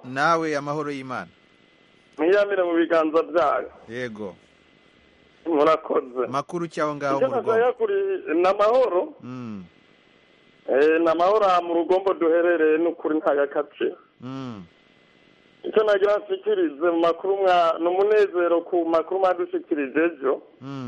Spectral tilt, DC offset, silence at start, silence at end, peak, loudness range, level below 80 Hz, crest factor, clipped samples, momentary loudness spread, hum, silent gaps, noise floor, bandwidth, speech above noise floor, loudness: -6 dB/octave; under 0.1%; 0.05 s; 0 s; -6 dBFS; 5 LU; -66 dBFS; 16 dB; under 0.1%; 16 LU; none; none; -57 dBFS; 10 kHz; 35 dB; -22 LUFS